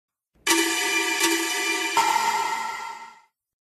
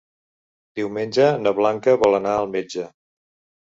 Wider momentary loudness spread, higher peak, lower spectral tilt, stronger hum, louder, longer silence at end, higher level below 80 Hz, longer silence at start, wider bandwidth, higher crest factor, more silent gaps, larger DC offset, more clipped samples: second, 11 LU vs 14 LU; about the same, -6 dBFS vs -4 dBFS; second, 0.5 dB/octave vs -5.5 dB/octave; neither; about the same, -22 LUFS vs -20 LUFS; about the same, 0.65 s vs 0.75 s; second, -68 dBFS vs -60 dBFS; second, 0.45 s vs 0.75 s; first, 15 kHz vs 7.8 kHz; about the same, 20 dB vs 18 dB; neither; neither; neither